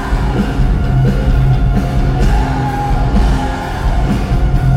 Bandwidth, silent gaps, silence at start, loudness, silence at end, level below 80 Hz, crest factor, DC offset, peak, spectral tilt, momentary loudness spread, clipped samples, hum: 11.5 kHz; none; 0 s; -15 LUFS; 0 s; -14 dBFS; 12 dB; under 0.1%; 0 dBFS; -7.5 dB/octave; 4 LU; under 0.1%; none